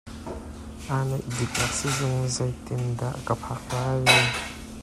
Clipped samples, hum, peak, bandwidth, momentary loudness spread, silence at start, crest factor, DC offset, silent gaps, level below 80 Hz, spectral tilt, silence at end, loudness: under 0.1%; none; -4 dBFS; 14 kHz; 19 LU; 0.05 s; 24 dB; under 0.1%; none; -46 dBFS; -4 dB/octave; 0 s; -25 LUFS